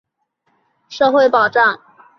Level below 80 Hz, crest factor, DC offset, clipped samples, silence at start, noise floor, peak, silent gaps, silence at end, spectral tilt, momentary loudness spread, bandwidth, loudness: -64 dBFS; 16 dB; under 0.1%; under 0.1%; 0.9 s; -67 dBFS; -2 dBFS; none; 0.45 s; -4 dB/octave; 17 LU; 6.6 kHz; -14 LUFS